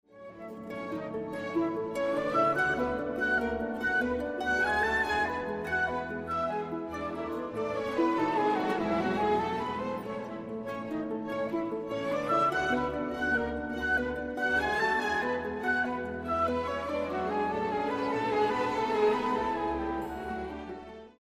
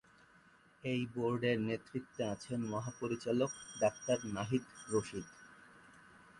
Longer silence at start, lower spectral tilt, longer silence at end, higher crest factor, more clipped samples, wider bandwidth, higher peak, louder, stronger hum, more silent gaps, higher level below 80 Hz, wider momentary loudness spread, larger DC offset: second, 0.15 s vs 0.85 s; about the same, -5.5 dB/octave vs -5.5 dB/octave; about the same, 0.1 s vs 0 s; about the same, 16 dB vs 20 dB; neither; first, 15.5 kHz vs 11.5 kHz; first, -14 dBFS vs -20 dBFS; first, -30 LUFS vs -38 LUFS; neither; neither; first, -54 dBFS vs -70 dBFS; about the same, 10 LU vs 11 LU; neither